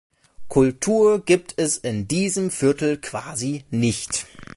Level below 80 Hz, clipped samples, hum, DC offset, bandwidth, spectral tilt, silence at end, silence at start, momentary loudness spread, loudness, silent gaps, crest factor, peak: -50 dBFS; under 0.1%; none; under 0.1%; 11.5 kHz; -5 dB/octave; 0.1 s; 0.4 s; 9 LU; -21 LUFS; none; 18 dB; -4 dBFS